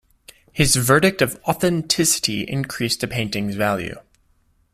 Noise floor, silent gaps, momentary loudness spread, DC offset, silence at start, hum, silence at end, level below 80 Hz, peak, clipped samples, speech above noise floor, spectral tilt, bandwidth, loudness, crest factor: -61 dBFS; none; 10 LU; under 0.1%; 0.55 s; none; 0.75 s; -44 dBFS; -2 dBFS; under 0.1%; 41 dB; -3.5 dB/octave; 16 kHz; -19 LUFS; 20 dB